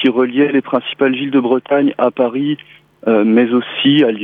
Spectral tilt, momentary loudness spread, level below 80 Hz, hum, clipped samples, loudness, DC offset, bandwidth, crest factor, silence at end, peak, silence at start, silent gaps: -8.5 dB/octave; 8 LU; -68 dBFS; none; under 0.1%; -14 LUFS; under 0.1%; 3.9 kHz; 12 dB; 0 s; -2 dBFS; 0 s; none